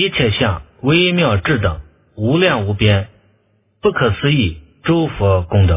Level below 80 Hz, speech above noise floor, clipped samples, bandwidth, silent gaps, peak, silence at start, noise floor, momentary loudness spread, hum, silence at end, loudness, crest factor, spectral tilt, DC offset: -30 dBFS; 45 dB; under 0.1%; 3.8 kHz; none; 0 dBFS; 0 s; -59 dBFS; 8 LU; none; 0 s; -16 LUFS; 16 dB; -10.5 dB/octave; under 0.1%